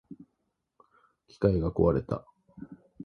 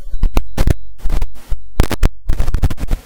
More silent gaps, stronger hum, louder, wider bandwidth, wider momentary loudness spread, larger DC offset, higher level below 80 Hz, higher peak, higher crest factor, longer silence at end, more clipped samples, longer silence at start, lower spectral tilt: neither; neither; second, -28 LUFS vs -21 LUFS; second, 6.6 kHz vs 17.5 kHz; first, 24 LU vs 7 LU; neither; second, -46 dBFS vs -16 dBFS; second, -10 dBFS vs 0 dBFS; first, 22 dB vs 10 dB; about the same, 0 s vs 0.1 s; neither; about the same, 0.1 s vs 0 s; first, -10 dB/octave vs -6 dB/octave